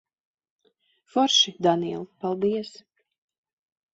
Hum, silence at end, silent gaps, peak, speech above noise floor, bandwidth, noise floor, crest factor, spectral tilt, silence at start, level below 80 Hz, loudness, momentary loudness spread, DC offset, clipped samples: none; 1.25 s; none; -8 dBFS; 44 dB; 8 kHz; -68 dBFS; 20 dB; -3.5 dB/octave; 1.15 s; -70 dBFS; -23 LUFS; 13 LU; under 0.1%; under 0.1%